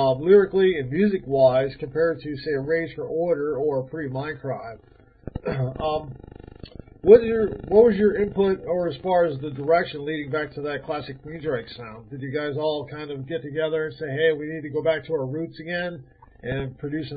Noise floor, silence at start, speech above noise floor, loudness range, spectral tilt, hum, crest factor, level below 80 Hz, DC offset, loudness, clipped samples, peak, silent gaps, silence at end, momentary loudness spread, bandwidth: -43 dBFS; 0 s; 20 dB; 9 LU; -11 dB/octave; none; 22 dB; -50 dBFS; under 0.1%; -23 LUFS; under 0.1%; -2 dBFS; none; 0 s; 17 LU; 4.9 kHz